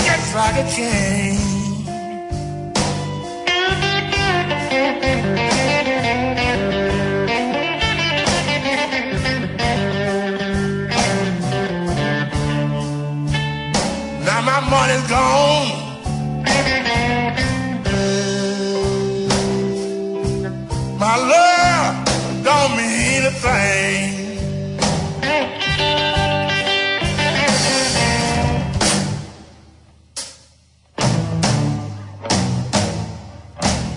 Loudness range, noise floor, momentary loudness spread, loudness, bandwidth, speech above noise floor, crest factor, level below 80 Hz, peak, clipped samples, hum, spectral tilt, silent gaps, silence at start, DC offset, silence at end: 4 LU; -52 dBFS; 9 LU; -18 LUFS; 11 kHz; 35 dB; 16 dB; -36 dBFS; -2 dBFS; under 0.1%; none; -4 dB/octave; none; 0 s; under 0.1%; 0 s